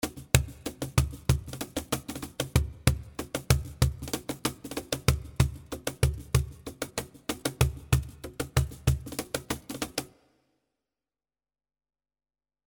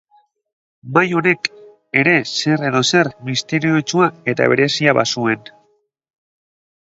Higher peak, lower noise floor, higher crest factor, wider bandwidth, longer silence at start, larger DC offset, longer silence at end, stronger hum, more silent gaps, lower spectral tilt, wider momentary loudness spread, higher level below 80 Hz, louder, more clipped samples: about the same, 0 dBFS vs 0 dBFS; first, under -90 dBFS vs -62 dBFS; first, 30 dB vs 18 dB; first, over 20 kHz vs 8 kHz; second, 0 s vs 0.85 s; neither; first, 2.6 s vs 1.5 s; neither; neither; about the same, -4.5 dB/octave vs -4.5 dB/octave; first, 10 LU vs 6 LU; first, -38 dBFS vs -62 dBFS; second, -31 LUFS vs -16 LUFS; neither